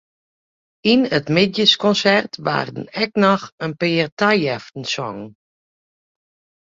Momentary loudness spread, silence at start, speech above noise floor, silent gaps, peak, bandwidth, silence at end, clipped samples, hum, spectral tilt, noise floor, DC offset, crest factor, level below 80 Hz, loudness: 12 LU; 0.85 s; over 72 dB; 3.52-3.58 s, 4.12-4.17 s; 0 dBFS; 7.8 kHz; 1.35 s; under 0.1%; none; -5 dB/octave; under -90 dBFS; under 0.1%; 20 dB; -60 dBFS; -18 LUFS